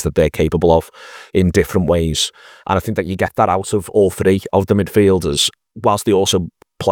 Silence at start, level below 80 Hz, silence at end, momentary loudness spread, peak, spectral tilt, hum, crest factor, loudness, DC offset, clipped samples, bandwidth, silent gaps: 0 s; -38 dBFS; 0 s; 7 LU; 0 dBFS; -5 dB/octave; none; 16 dB; -16 LUFS; under 0.1%; under 0.1%; 20 kHz; none